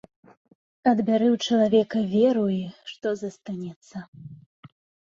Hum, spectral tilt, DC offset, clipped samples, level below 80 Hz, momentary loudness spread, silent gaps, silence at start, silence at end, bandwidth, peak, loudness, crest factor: none; -6.5 dB/octave; under 0.1%; under 0.1%; -68 dBFS; 19 LU; 3.76-3.82 s, 4.08-4.13 s, 4.46-4.63 s; 0.85 s; 0.45 s; 7.6 kHz; -6 dBFS; -23 LUFS; 18 dB